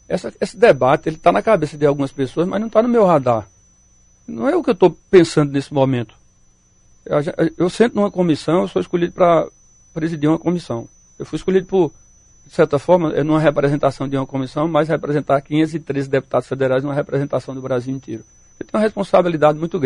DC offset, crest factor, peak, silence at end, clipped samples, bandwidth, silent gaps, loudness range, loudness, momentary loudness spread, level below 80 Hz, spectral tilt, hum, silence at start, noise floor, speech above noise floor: under 0.1%; 18 dB; 0 dBFS; 0 s; under 0.1%; 11 kHz; none; 4 LU; -18 LUFS; 11 LU; -48 dBFS; -7 dB/octave; none; 0.1 s; -54 dBFS; 37 dB